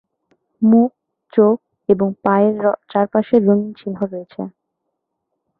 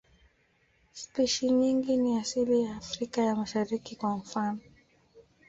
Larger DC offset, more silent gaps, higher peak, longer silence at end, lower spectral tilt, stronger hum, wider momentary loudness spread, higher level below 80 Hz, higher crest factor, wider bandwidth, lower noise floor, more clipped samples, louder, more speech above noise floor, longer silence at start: neither; neither; first, -2 dBFS vs -16 dBFS; first, 1.1 s vs 0.25 s; first, -11.5 dB/octave vs -4.5 dB/octave; neither; about the same, 13 LU vs 11 LU; about the same, -60 dBFS vs -64 dBFS; about the same, 16 dB vs 14 dB; second, 4.3 kHz vs 8 kHz; first, -76 dBFS vs -69 dBFS; neither; first, -17 LUFS vs -29 LUFS; first, 60 dB vs 40 dB; second, 0.6 s vs 0.95 s